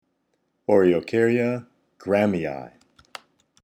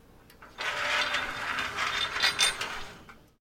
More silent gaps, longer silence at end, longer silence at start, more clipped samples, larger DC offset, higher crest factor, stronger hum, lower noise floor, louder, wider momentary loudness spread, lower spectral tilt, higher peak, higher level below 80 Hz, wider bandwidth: neither; first, 0.95 s vs 0.2 s; first, 0.7 s vs 0.3 s; neither; neither; about the same, 20 dB vs 24 dB; neither; first, -72 dBFS vs -53 dBFS; first, -22 LUFS vs -28 LUFS; first, 24 LU vs 11 LU; first, -7.5 dB/octave vs 0 dB/octave; about the same, -6 dBFS vs -8 dBFS; second, -62 dBFS vs -56 dBFS; second, 12 kHz vs 16.5 kHz